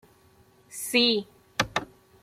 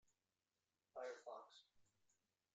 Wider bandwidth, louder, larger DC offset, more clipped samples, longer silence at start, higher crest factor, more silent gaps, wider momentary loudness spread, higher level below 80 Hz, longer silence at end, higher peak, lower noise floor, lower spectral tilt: first, 16.5 kHz vs 8.8 kHz; first, -26 LUFS vs -56 LUFS; neither; neither; second, 0.7 s vs 0.95 s; about the same, 22 dB vs 20 dB; neither; about the same, 14 LU vs 13 LU; first, -58 dBFS vs under -90 dBFS; second, 0.4 s vs 0.7 s; first, -6 dBFS vs -42 dBFS; second, -59 dBFS vs under -90 dBFS; about the same, -2.5 dB/octave vs -1.5 dB/octave